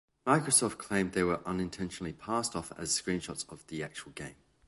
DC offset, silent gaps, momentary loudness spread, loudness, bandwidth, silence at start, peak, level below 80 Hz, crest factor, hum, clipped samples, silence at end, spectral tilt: under 0.1%; none; 15 LU; -32 LUFS; 12 kHz; 0.25 s; -12 dBFS; -58 dBFS; 22 dB; none; under 0.1%; 0.35 s; -3.5 dB/octave